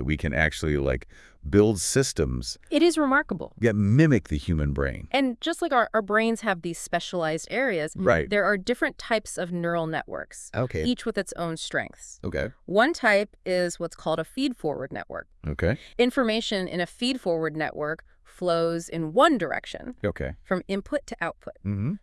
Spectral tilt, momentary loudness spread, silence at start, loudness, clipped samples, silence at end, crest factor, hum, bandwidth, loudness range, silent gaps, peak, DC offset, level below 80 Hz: -5 dB/octave; 11 LU; 0 s; -26 LUFS; under 0.1%; 0.05 s; 20 dB; none; 12 kHz; 4 LU; none; -4 dBFS; under 0.1%; -44 dBFS